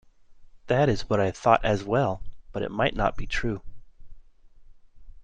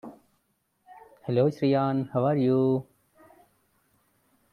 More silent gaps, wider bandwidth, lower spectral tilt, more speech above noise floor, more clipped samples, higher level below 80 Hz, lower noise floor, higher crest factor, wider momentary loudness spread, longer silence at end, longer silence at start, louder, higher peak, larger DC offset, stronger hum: neither; first, 9.2 kHz vs 6.6 kHz; second, -6 dB/octave vs -9.5 dB/octave; second, 25 dB vs 49 dB; neither; first, -40 dBFS vs -70 dBFS; second, -50 dBFS vs -73 dBFS; about the same, 22 dB vs 18 dB; first, 12 LU vs 9 LU; second, 0 s vs 1.7 s; first, 0.3 s vs 0.05 s; about the same, -26 LUFS vs -25 LUFS; first, -4 dBFS vs -12 dBFS; neither; neither